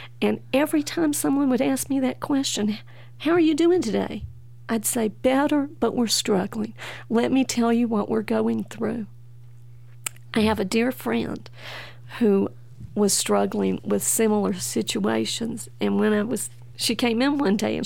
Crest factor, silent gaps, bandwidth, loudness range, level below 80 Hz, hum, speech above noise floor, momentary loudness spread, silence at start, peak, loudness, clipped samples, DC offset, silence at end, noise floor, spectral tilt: 18 dB; none; 17 kHz; 3 LU; -56 dBFS; none; 23 dB; 13 LU; 0 s; -6 dBFS; -23 LUFS; under 0.1%; 0.6%; 0 s; -46 dBFS; -4 dB/octave